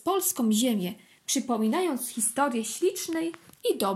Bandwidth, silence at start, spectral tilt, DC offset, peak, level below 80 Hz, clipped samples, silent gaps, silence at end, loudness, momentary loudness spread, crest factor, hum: 16.5 kHz; 0.05 s; -3.5 dB/octave; under 0.1%; -14 dBFS; -78 dBFS; under 0.1%; none; 0 s; -27 LUFS; 8 LU; 14 dB; none